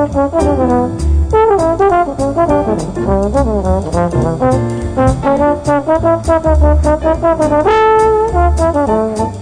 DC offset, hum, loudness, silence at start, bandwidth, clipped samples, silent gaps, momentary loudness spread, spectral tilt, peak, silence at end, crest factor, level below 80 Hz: under 0.1%; none; -12 LUFS; 0 s; 10 kHz; under 0.1%; none; 5 LU; -7.5 dB/octave; 0 dBFS; 0 s; 10 dB; -20 dBFS